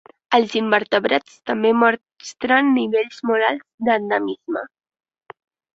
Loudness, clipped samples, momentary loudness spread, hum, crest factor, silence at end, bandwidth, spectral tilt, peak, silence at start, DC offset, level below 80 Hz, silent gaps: -19 LUFS; under 0.1%; 12 LU; none; 18 dB; 1.1 s; 7.8 kHz; -4.5 dB/octave; -2 dBFS; 0.3 s; under 0.1%; -66 dBFS; 3.74-3.78 s